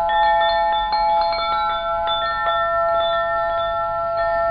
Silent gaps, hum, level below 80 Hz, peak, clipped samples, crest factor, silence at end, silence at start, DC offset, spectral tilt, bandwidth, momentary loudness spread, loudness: none; 50 Hz at -45 dBFS; -42 dBFS; -8 dBFS; under 0.1%; 12 dB; 0 s; 0 s; under 0.1%; -7.5 dB/octave; 5.2 kHz; 4 LU; -19 LUFS